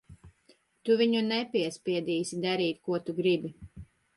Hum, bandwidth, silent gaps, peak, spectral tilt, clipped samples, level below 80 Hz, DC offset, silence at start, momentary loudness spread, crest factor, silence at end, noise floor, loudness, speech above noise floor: none; 11.5 kHz; none; -14 dBFS; -5 dB/octave; under 0.1%; -62 dBFS; under 0.1%; 0.1 s; 12 LU; 16 dB; 0.3 s; -65 dBFS; -29 LUFS; 37 dB